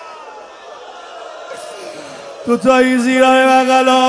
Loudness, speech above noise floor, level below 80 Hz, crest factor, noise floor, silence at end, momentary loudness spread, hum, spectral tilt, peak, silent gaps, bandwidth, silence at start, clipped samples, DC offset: -11 LUFS; 22 dB; -56 dBFS; 14 dB; -34 dBFS; 0 s; 24 LU; none; -3.5 dB/octave; 0 dBFS; none; 11 kHz; 0 s; under 0.1%; under 0.1%